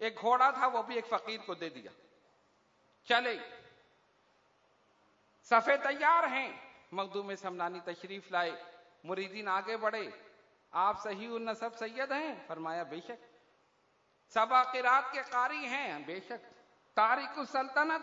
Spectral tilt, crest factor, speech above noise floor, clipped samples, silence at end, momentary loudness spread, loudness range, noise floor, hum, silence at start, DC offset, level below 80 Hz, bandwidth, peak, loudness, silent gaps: -0.5 dB/octave; 22 dB; 38 dB; under 0.1%; 0 s; 16 LU; 7 LU; -72 dBFS; none; 0 s; under 0.1%; -86 dBFS; 7.4 kHz; -12 dBFS; -33 LUFS; none